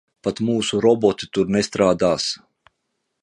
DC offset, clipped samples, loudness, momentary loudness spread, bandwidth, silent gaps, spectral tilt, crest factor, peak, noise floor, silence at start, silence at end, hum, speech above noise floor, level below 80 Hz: under 0.1%; under 0.1%; -20 LUFS; 8 LU; 11 kHz; none; -5 dB/octave; 18 dB; -2 dBFS; -75 dBFS; 0.25 s; 0.85 s; none; 56 dB; -52 dBFS